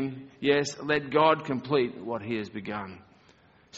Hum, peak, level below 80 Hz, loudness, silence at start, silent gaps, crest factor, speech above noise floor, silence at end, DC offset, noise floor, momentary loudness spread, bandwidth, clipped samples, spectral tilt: none; -8 dBFS; -66 dBFS; -28 LUFS; 0 s; none; 20 dB; 32 dB; 0 s; under 0.1%; -59 dBFS; 13 LU; 8 kHz; under 0.1%; -3.5 dB/octave